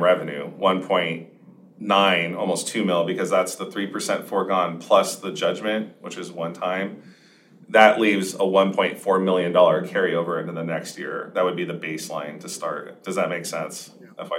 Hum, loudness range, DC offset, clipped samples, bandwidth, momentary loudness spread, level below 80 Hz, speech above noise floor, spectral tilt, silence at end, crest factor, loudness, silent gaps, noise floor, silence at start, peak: none; 8 LU; under 0.1%; under 0.1%; 16 kHz; 14 LU; -80 dBFS; 29 dB; -4 dB/octave; 0 s; 22 dB; -22 LUFS; none; -52 dBFS; 0 s; 0 dBFS